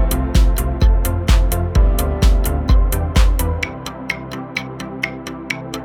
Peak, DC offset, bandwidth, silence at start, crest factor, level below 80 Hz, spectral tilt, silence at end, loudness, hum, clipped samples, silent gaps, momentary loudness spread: -2 dBFS; under 0.1%; 16 kHz; 0 s; 14 dB; -16 dBFS; -5.5 dB/octave; 0 s; -19 LUFS; none; under 0.1%; none; 9 LU